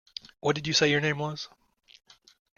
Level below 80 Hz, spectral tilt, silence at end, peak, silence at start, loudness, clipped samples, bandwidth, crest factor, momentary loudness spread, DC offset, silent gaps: -64 dBFS; -3.5 dB/octave; 1.1 s; -10 dBFS; 0.45 s; -26 LUFS; under 0.1%; 7.2 kHz; 22 dB; 18 LU; under 0.1%; none